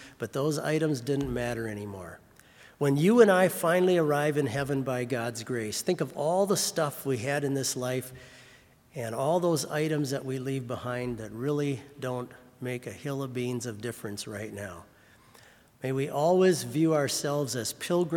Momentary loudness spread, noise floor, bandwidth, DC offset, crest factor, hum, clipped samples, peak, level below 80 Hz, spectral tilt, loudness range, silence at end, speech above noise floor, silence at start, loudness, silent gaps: 14 LU; -57 dBFS; 18 kHz; under 0.1%; 20 dB; none; under 0.1%; -8 dBFS; -60 dBFS; -5 dB/octave; 10 LU; 0 s; 29 dB; 0 s; -29 LUFS; none